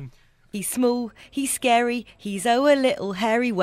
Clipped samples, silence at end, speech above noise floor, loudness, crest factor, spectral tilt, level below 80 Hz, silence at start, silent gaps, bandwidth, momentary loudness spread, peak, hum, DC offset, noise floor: under 0.1%; 0 s; 24 dB; -23 LUFS; 16 dB; -3.5 dB/octave; -60 dBFS; 0 s; none; 16 kHz; 11 LU; -6 dBFS; none; under 0.1%; -46 dBFS